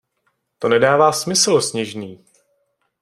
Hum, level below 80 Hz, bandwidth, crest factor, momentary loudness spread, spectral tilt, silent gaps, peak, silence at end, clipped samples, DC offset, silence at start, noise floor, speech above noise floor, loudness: none; -62 dBFS; 15.5 kHz; 18 dB; 15 LU; -3 dB/octave; none; -2 dBFS; 0.9 s; under 0.1%; under 0.1%; 0.6 s; -69 dBFS; 52 dB; -16 LUFS